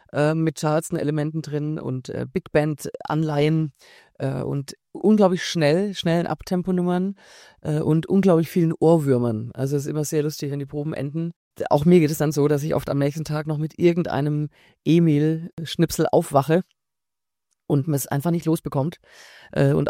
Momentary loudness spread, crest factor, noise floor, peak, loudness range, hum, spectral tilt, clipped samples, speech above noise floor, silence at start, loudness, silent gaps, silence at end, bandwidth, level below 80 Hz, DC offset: 11 LU; 18 dB; -88 dBFS; -4 dBFS; 4 LU; none; -7 dB/octave; under 0.1%; 67 dB; 0.15 s; -22 LUFS; 11.36-11.51 s, 15.53-15.57 s; 0 s; 16.5 kHz; -54 dBFS; under 0.1%